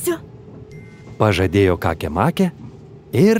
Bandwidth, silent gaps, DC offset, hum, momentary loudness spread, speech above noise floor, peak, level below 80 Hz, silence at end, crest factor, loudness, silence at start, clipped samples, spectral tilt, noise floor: 16 kHz; none; under 0.1%; none; 23 LU; 22 dB; -2 dBFS; -42 dBFS; 0 s; 18 dB; -19 LUFS; 0 s; under 0.1%; -6.5 dB/octave; -38 dBFS